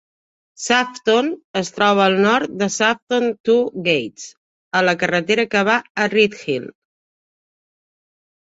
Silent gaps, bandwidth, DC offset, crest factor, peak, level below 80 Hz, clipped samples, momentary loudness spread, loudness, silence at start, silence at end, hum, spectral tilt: 1.44-1.54 s, 3.02-3.07 s, 3.40-3.44 s, 4.37-4.71 s, 5.90-5.95 s; 8.2 kHz; under 0.1%; 18 dB; 0 dBFS; -64 dBFS; under 0.1%; 10 LU; -18 LUFS; 0.6 s; 1.75 s; none; -4 dB/octave